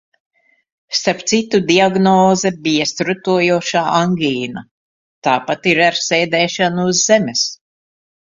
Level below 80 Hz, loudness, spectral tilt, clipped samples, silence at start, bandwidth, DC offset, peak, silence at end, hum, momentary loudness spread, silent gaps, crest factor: -58 dBFS; -15 LUFS; -3.5 dB/octave; under 0.1%; 0.9 s; 7.8 kHz; under 0.1%; 0 dBFS; 0.75 s; none; 7 LU; 4.71-5.22 s; 16 dB